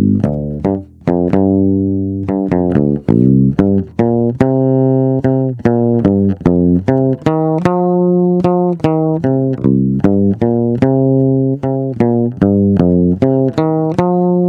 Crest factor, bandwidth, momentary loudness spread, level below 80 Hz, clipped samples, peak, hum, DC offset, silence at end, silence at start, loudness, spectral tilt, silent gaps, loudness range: 12 dB; 6.8 kHz; 4 LU; -38 dBFS; 0.2%; 0 dBFS; none; under 0.1%; 0 s; 0 s; -13 LUFS; -10.5 dB/octave; none; 1 LU